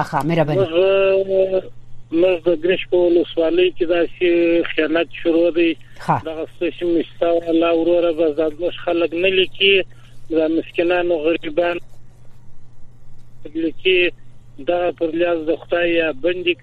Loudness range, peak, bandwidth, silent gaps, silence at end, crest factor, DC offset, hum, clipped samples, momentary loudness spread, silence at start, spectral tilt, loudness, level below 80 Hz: 5 LU; -2 dBFS; 5.6 kHz; none; 0.1 s; 16 dB; under 0.1%; none; under 0.1%; 7 LU; 0 s; -7 dB/octave; -18 LUFS; -44 dBFS